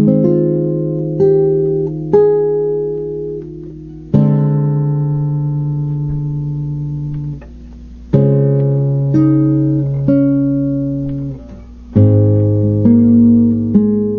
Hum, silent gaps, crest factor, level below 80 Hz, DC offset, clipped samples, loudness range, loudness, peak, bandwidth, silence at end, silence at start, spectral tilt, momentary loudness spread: none; none; 12 dB; -38 dBFS; under 0.1%; under 0.1%; 5 LU; -14 LUFS; 0 dBFS; 2.4 kHz; 0 s; 0 s; -13 dB/octave; 12 LU